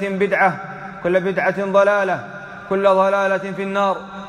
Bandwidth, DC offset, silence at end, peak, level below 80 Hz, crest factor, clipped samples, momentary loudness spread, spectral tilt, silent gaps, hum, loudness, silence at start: 10 kHz; under 0.1%; 0 s; -4 dBFS; -58 dBFS; 16 dB; under 0.1%; 12 LU; -6 dB/octave; none; none; -18 LUFS; 0 s